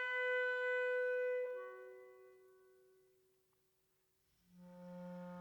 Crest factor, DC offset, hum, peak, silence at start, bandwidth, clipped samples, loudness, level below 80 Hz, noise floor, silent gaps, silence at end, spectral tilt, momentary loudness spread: 16 dB; under 0.1%; none; -28 dBFS; 0 s; 19 kHz; under 0.1%; -39 LUFS; under -90 dBFS; -80 dBFS; none; 0 s; -5.5 dB/octave; 21 LU